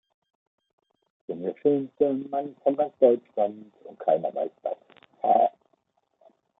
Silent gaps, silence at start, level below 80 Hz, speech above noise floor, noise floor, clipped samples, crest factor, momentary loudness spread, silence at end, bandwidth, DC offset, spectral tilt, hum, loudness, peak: none; 1.3 s; -80 dBFS; 46 dB; -71 dBFS; under 0.1%; 22 dB; 13 LU; 1.1 s; 3.9 kHz; under 0.1%; -10.5 dB/octave; none; -26 LUFS; -6 dBFS